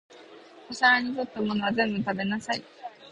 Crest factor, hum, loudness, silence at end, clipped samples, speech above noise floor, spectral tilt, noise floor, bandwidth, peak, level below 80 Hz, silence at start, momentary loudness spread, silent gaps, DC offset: 20 dB; none; -26 LUFS; 0 s; under 0.1%; 23 dB; -4.5 dB/octave; -49 dBFS; 10.5 kHz; -8 dBFS; -64 dBFS; 0.1 s; 17 LU; none; under 0.1%